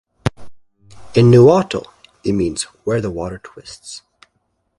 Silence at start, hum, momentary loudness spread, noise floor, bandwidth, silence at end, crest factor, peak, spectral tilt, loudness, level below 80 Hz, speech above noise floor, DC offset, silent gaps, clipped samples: 0.25 s; none; 25 LU; -68 dBFS; 11.5 kHz; 0.8 s; 18 dB; 0 dBFS; -6.5 dB/octave; -16 LUFS; -44 dBFS; 53 dB; under 0.1%; none; under 0.1%